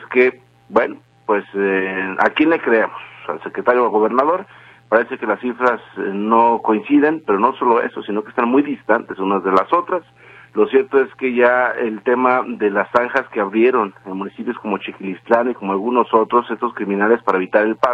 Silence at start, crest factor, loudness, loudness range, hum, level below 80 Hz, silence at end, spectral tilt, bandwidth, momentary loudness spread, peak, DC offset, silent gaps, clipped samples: 0 s; 18 dB; -17 LUFS; 2 LU; none; -62 dBFS; 0 s; -7.5 dB/octave; 6.6 kHz; 10 LU; 0 dBFS; under 0.1%; none; under 0.1%